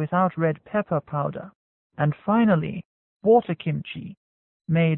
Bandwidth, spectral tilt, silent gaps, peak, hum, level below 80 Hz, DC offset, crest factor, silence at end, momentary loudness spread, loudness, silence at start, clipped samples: 4 kHz; -12.5 dB/octave; 1.55-1.90 s, 2.85-3.20 s, 4.17-4.60 s; -8 dBFS; none; -60 dBFS; under 0.1%; 16 dB; 0 s; 18 LU; -24 LUFS; 0 s; under 0.1%